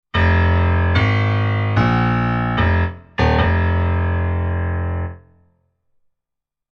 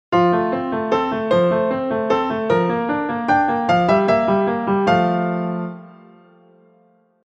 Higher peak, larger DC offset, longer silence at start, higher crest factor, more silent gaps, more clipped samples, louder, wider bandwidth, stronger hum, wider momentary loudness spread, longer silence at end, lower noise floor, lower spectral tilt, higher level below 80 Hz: about the same, -2 dBFS vs -4 dBFS; neither; about the same, 0.15 s vs 0.1 s; about the same, 14 dB vs 16 dB; neither; neither; about the same, -18 LUFS vs -18 LUFS; second, 6 kHz vs 8 kHz; neither; about the same, 7 LU vs 6 LU; first, 1.55 s vs 1.35 s; first, -83 dBFS vs -57 dBFS; about the same, -8.5 dB/octave vs -7.5 dB/octave; first, -28 dBFS vs -54 dBFS